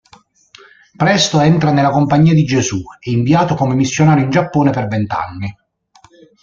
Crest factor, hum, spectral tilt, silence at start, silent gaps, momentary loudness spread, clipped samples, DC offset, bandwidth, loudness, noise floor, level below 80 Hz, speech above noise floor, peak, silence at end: 14 dB; none; -6 dB/octave; 1 s; none; 9 LU; under 0.1%; under 0.1%; 7.6 kHz; -14 LUFS; -50 dBFS; -46 dBFS; 37 dB; 0 dBFS; 0.9 s